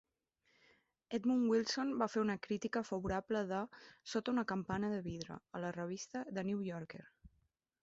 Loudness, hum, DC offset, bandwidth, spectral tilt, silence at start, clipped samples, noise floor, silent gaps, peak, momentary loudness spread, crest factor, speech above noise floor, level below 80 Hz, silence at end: -39 LUFS; none; under 0.1%; 8 kHz; -5 dB/octave; 1.1 s; under 0.1%; -80 dBFS; none; -20 dBFS; 13 LU; 20 dB; 41 dB; -66 dBFS; 0.55 s